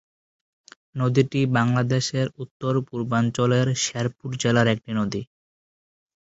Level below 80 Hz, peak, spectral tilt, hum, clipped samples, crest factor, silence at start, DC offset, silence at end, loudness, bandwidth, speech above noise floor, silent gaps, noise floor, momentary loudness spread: -58 dBFS; -4 dBFS; -5.5 dB/octave; none; under 0.1%; 20 dB; 0.95 s; under 0.1%; 0.95 s; -23 LUFS; 8 kHz; over 68 dB; 2.51-2.60 s; under -90 dBFS; 8 LU